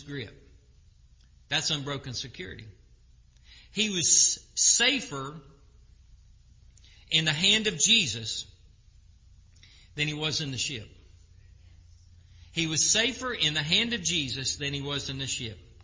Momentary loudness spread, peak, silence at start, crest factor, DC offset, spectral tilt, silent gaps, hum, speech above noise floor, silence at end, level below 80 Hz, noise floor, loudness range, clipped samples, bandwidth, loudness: 19 LU; -8 dBFS; 0 s; 24 dB; under 0.1%; -1.5 dB/octave; none; none; 29 dB; 0.25 s; -54 dBFS; -57 dBFS; 10 LU; under 0.1%; 7.8 kHz; -25 LUFS